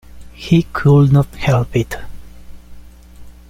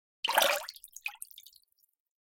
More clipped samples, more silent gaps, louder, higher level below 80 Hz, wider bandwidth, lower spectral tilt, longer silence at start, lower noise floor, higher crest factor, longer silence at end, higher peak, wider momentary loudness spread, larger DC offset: neither; neither; first, -14 LUFS vs -30 LUFS; first, -36 dBFS vs -78 dBFS; second, 15 kHz vs 17 kHz; first, -8 dB/octave vs 1.5 dB/octave; about the same, 0.15 s vs 0.25 s; second, -37 dBFS vs -67 dBFS; second, 14 dB vs 26 dB; second, 0.2 s vs 0.9 s; first, -2 dBFS vs -8 dBFS; second, 16 LU vs 20 LU; neither